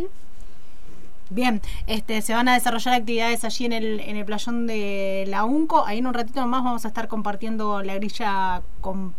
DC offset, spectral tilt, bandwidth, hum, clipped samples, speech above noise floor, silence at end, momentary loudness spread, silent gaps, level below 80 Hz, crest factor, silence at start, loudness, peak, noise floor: 8%; -4 dB/octave; 16 kHz; none; under 0.1%; 23 dB; 0.05 s; 9 LU; none; -40 dBFS; 18 dB; 0 s; -24 LUFS; -6 dBFS; -47 dBFS